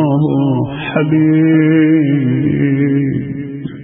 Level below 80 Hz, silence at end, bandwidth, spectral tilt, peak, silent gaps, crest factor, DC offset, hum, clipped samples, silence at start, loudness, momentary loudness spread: -46 dBFS; 0 s; 3.8 kHz; -14 dB/octave; 0 dBFS; none; 12 dB; under 0.1%; none; under 0.1%; 0 s; -13 LUFS; 9 LU